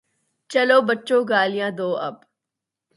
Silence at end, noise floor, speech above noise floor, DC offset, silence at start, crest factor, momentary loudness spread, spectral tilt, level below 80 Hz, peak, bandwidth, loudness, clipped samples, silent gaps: 0.8 s; -85 dBFS; 65 dB; under 0.1%; 0.5 s; 18 dB; 9 LU; -4.5 dB/octave; -76 dBFS; -4 dBFS; 11.5 kHz; -20 LUFS; under 0.1%; none